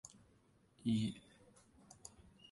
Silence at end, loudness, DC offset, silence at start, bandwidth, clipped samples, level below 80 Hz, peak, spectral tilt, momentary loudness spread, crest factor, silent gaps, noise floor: 1.3 s; -40 LUFS; under 0.1%; 0.05 s; 11.5 kHz; under 0.1%; -72 dBFS; -26 dBFS; -5.5 dB/octave; 24 LU; 20 dB; none; -71 dBFS